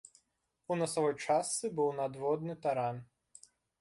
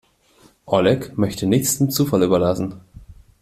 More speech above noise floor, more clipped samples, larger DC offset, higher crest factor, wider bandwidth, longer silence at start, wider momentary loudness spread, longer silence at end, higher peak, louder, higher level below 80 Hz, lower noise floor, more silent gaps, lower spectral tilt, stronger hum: first, 47 dB vs 36 dB; neither; neither; about the same, 16 dB vs 18 dB; second, 11.5 kHz vs 16 kHz; about the same, 0.7 s vs 0.65 s; about the same, 6 LU vs 6 LU; first, 0.75 s vs 0.3 s; second, -18 dBFS vs -2 dBFS; second, -34 LUFS vs -19 LUFS; second, -76 dBFS vs -50 dBFS; first, -81 dBFS vs -54 dBFS; neither; about the same, -4.5 dB/octave vs -5.5 dB/octave; neither